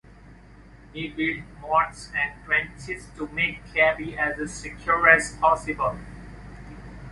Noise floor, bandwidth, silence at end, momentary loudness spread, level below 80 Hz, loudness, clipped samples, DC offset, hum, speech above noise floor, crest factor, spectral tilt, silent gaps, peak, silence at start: -48 dBFS; 11.5 kHz; 0 s; 24 LU; -46 dBFS; -23 LUFS; under 0.1%; under 0.1%; none; 24 dB; 24 dB; -4 dB/octave; none; -2 dBFS; 0.25 s